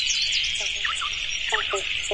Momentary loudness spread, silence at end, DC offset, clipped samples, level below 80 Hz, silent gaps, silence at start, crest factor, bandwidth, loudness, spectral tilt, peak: 5 LU; 0 s; 0.1%; under 0.1%; -46 dBFS; none; 0 s; 16 dB; 11.5 kHz; -23 LUFS; 1 dB/octave; -10 dBFS